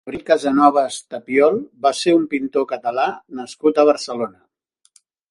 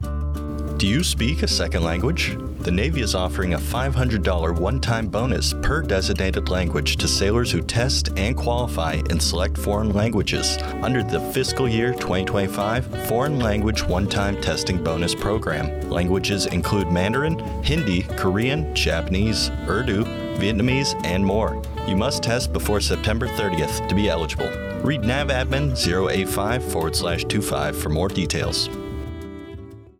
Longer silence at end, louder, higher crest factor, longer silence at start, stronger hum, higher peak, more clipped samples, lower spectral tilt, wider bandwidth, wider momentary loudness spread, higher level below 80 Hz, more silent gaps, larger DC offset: first, 1 s vs 0.15 s; first, -18 LUFS vs -22 LUFS; about the same, 18 dB vs 14 dB; about the same, 0.05 s vs 0 s; neither; first, -2 dBFS vs -8 dBFS; neither; about the same, -4.5 dB/octave vs -5 dB/octave; second, 11.5 kHz vs 16.5 kHz; first, 12 LU vs 4 LU; second, -62 dBFS vs -30 dBFS; neither; neither